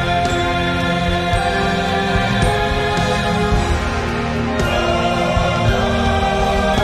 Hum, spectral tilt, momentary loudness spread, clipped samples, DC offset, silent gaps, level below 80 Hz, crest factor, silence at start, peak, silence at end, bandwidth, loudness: none; -5.5 dB/octave; 2 LU; under 0.1%; under 0.1%; none; -26 dBFS; 14 dB; 0 s; -4 dBFS; 0 s; 14.5 kHz; -17 LUFS